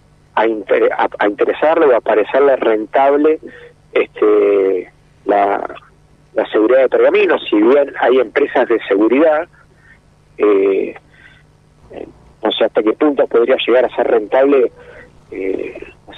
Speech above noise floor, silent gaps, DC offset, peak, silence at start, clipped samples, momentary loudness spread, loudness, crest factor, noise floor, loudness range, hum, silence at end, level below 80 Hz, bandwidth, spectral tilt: 35 dB; none; under 0.1%; -2 dBFS; 0.35 s; under 0.1%; 11 LU; -14 LUFS; 12 dB; -48 dBFS; 4 LU; 50 Hz at -50 dBFS; 0 s; -54 dBFS; 4.8 kHz; -6.5 dB/octave